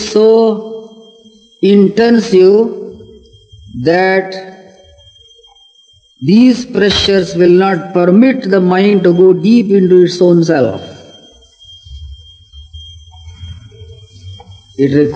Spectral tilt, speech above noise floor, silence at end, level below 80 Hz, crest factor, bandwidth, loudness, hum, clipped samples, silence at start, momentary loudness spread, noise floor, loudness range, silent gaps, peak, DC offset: -6.5 dB/octave; 39 dB; 0 s; -42 dBFS; 12 dB; 8.6 kHz; -10 LUFS; none; 0.2%; 0 s; 24 LU; -48 dBFS; 9 LU; none; 0 dBFS; under 0.1%